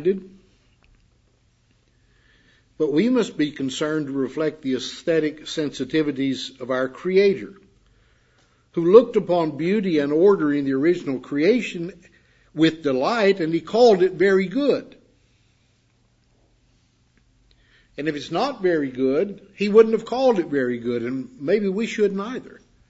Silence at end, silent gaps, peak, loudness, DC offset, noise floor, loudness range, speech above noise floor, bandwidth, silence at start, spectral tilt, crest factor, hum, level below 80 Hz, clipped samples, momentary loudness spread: 0.35 s; none; 0 dBFS; -21 LUFS; under 0.1%; -62 dBFS; 8 LU; 42 dB; 8 kHz; 0 s; -6 dB/octave; 22 dB; none; -62 dBFS; under 0.1%; 13 LU